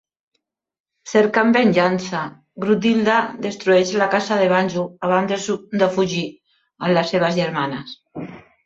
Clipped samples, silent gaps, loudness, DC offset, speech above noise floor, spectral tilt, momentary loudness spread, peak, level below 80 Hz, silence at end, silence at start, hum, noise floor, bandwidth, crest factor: under 0.1%; none; -19 LUFS; under 0.1%; 56 dB; -5.5 dB/octave; 15 LU; -2 dBFS; -62 dBFS; 0.25 s; 1.05 s; none; -74 dBFS; 8 kHz; 18 dB